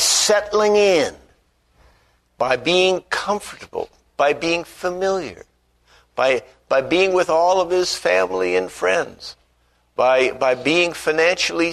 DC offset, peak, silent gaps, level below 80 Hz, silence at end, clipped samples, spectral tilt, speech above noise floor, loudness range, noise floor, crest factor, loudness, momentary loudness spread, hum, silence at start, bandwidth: under 0.1%; -2 dBFS; none; -54 dBFS; 0 s; under 0.1%; -2.5 dB/octave; 43 dB; 4 LU; -62 dBFS; 16 dB; -18 LUFS; 14 LU; 60 Hz at -55 dBFS; 0 s; 13.5 kHz